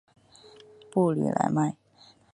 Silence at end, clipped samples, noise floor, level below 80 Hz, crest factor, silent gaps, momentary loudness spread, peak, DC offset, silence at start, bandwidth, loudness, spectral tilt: 0.6 s; under 0.1%; -58 dBFS; -70 dBFS; 20 dB; none; 6 LU; -8 dBFS; under 0.1%; 0.95 s; 11.5 kHz; -27 LUFS; -7.5 dB/octave